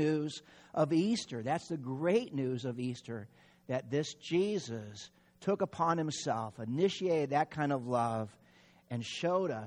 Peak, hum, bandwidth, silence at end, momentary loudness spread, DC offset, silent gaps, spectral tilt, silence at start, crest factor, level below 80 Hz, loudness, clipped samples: -16 dBFS; none; 10.5 kHz; 0 s; 12 LU; under 0.1%; none; -6 dB/octave; 0 s; 18 dB; -74 dBFS; -34 LUFS; under 0.1%